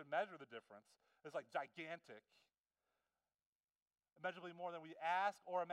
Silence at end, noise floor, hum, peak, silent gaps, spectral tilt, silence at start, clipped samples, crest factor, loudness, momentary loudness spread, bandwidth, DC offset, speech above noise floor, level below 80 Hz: 0 s; under -90 dBFS; none; -28 dBFS; 2.60-2.64 s, 3.46-3.68 s, 3.82-3.86 s; -4.5 dB/octave; 0 s; under 0.1%; 22 dB; -47 LUFS; 21 LU; 13 kHz; under 0.1%; over 43 dB; under -90 dBFS